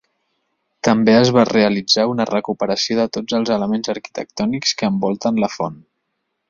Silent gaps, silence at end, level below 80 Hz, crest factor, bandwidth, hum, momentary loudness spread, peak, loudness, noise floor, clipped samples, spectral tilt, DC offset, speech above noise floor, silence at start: none; 0.7 s; -56 dBFS; 16 dB; 7.4 kHz; none; 10 LU; -2 dBFS; -17 LUFS; -73 dBFS; under 0.1%; -4.5 dB/octave; under 0.1%; 56 dB; 0.85 s